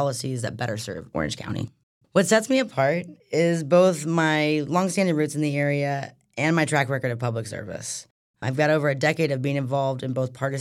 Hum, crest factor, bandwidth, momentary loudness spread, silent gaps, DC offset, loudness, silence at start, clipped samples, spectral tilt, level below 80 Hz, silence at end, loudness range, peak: none; 18 dB; 15 kHz; 12 LU; 1.83-2.01 s, 8.11-8.34 s; under 0.1%; -24 LUFS; 0 s; under 0.1%; -5.5 dB/octave; -60 dBFS; 0 s; 4 LU; -6 dBFS